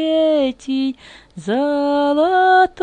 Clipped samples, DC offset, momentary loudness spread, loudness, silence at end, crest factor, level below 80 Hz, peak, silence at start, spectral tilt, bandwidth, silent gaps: under 0.1%; under 0.1%; 11 LU; -17 LUFS; 0 s; 14 dB; -54 dBFS; -4 dBFS; 0 s; -5 dB/octave; 9.4 kHz; none